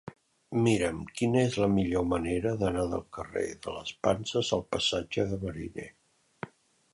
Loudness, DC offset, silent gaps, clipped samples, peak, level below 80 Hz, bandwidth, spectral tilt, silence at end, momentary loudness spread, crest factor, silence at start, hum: -30 LUFS; under 0.1%; none; under 0.1%; -10 dBFS; -50 dBFS; 11.5 kHz; -5.5 dB/octave; 0.45 s; 17 LU; 20 dB; 0.05 s; none